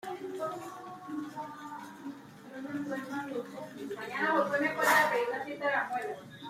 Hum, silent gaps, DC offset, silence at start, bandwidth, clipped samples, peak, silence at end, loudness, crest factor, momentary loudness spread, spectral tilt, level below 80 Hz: none; none; under 0.1%; 0.05 s; 16 kHz; under 0.1%; -14 dBFS; 0 s; -32 LUFS; 20 dB; 19 LU; -3.5 dB/octave; -80 dBFS